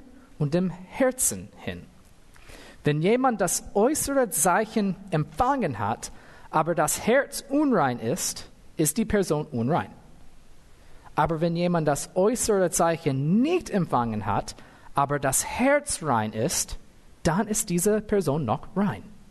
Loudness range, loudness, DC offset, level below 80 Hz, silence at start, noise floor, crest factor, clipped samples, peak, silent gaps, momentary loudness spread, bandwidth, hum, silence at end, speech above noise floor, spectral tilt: 3 LU; -25 LUFS; under 0.1%; -48 dBFS; 0 s; -50 dBFS; 16 dB; under 0.1%; -10 dBFS; none; 9 LU; 12.5 kHz; none; 0.1 s; 26 dB; -4.5 dB/octave